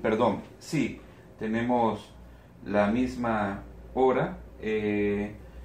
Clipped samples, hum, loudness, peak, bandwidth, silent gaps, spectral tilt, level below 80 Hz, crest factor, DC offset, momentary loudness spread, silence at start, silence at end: under 0.1%; none; -29 LUFS; -12 dBFS; 14.5 kHz; none; -7 dB/octave; -50 dBFS; 18 dB; under 0.1%; 12 LU; 0 s; 0 s